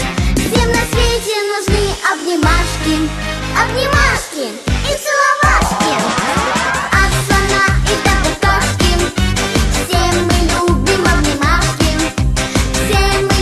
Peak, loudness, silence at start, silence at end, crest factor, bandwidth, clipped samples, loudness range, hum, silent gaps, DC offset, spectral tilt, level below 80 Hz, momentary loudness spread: 0 dBFS; -14 LUFS; 0 s; 0 s; 14 dB; 13 kHz; under 0.1%; 2 LU; none; none; under 0.1%; -4 dB/octave; -20 dBFS; 4 LU